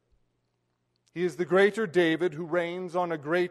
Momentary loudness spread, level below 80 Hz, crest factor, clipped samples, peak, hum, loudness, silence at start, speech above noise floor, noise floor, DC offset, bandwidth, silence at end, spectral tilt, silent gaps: 9 LU; -74 dBFS; 18 dB; under 0.1%; -10 dBFS; none; -27 LUFS; 1.15 s; 50 dB; -76 dBFS; under 0.1%; 12 kHz; 0 s; -6 dB/octave; none